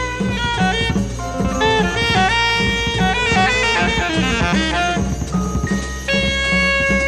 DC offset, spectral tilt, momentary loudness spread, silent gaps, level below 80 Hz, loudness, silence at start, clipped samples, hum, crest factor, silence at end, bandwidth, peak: under 0.1%; -4.5 dB/octave; 7 LU; none; -28 dBFS; -17 LUFS; 0 s; under 0.1%; none; 14 dB; 0 s; 13 kHz; -4 dBFS